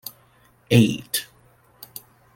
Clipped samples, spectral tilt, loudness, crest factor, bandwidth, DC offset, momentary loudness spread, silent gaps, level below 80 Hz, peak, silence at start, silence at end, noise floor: under 0.1%; -5.5 dB/octave; -21 LUFS; 22 dB; 17 kHz; under 0.1%; 23 LU; none; -58 dBFS; -2 dBFS; 0.7 s; 1.1 s; -57 dBFS